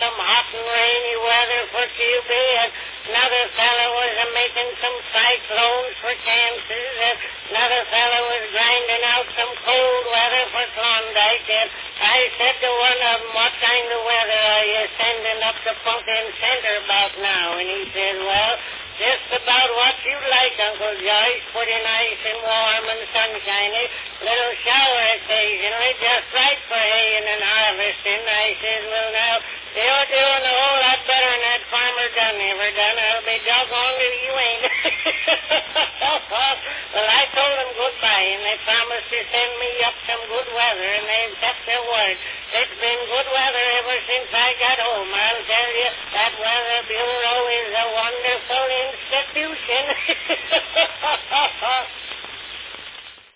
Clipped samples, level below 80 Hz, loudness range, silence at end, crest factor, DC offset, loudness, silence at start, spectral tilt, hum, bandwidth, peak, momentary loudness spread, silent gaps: under 0.1%; -56 dBFS; 3 LU; 0.2 s; 18 dB; under 0.1%; -18 LUFS; 0 s; -4 dB/octave; none; 4 kHz; -2 dBFS; 7 LU; none